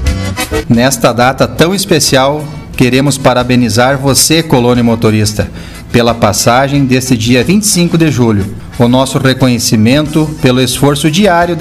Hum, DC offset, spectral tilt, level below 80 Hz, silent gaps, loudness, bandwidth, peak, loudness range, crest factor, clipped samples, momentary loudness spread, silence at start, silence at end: none; 0.4%; -4.5 dB/octave; -28 dBFS; none; -9 LUFS; 16 kHz; 0 dBFS; 1 LU; 8 dB; 0.4%; 6 LU; 0 s; 0 s